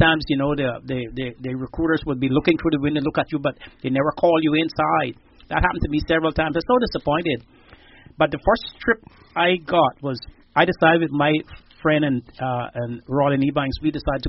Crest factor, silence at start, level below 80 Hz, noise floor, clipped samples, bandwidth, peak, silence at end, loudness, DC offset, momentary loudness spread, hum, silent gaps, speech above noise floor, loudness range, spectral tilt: 20 dB; 0 s; -40 dBFS; -48 dBFS; under 0.1%; 5.8 kHz; 0 dBFS; 0 s; -21 LUFS; under 0.1%; 10 LU; none; none; 27 dB; 2 LU; -4 dB/octave